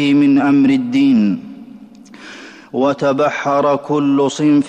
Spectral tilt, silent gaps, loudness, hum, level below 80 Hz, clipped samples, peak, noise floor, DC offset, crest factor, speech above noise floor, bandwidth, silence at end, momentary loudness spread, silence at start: -6.5 dB/octave; none; -14 LUFS; none; -58 dBFS; under 0.1%; -6 dBFS; -38 dBFS; under 0.1%; 8 dB; 25 dB; 8.6 kHz; 0 s; 22 LU; 0 s